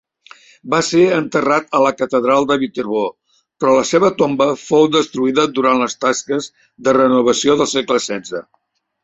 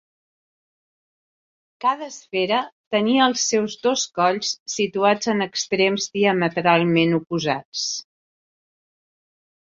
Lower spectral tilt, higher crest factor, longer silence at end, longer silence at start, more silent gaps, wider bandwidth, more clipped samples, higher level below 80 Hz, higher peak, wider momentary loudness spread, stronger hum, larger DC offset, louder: about the same, -4 dB/octave vs -3.5 dB/octave; second, 14 dB vs 20 dB; second, 0.6 s vs 1.7 s; second, 0.65 s vs 1.8 s; second, none vs 2.72-2.91 s, 4.60-4.66 s, 7.65-7.72 s; about the same, 8.2 kHz vs 7.8 kHz; neither; first, -56 dBFS vs -66 dBFS; about the same, -2 dBFS vs -2 dBFS; about the same, 9 LU vs 7 LU; neither; neither; first, -15 LUFS vs -21 LUFS